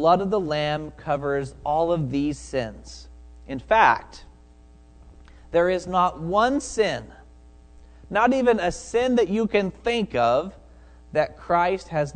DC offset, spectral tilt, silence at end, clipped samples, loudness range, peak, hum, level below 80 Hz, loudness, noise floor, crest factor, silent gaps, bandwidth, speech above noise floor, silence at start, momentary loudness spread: under 0.1%; -5.5 dB/octave; 0 s; under 0.1%; 3 LU; -4 dBFS; none; -46 dBFS; -23 LUFS; -50 dBFS; 20 dB; none; 9.4 kHz; 27 dB; 0 s; 10 LU